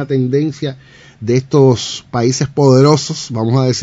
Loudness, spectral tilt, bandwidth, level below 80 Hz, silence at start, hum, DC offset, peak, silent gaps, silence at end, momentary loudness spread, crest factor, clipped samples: -14 LUFS; -6 dB/octave; 8 kHz; -50 dBFS; 0 s; none; under 0.1%; 0 dBFS; none; 0 s; 11 LU; 14 dB; 0.2%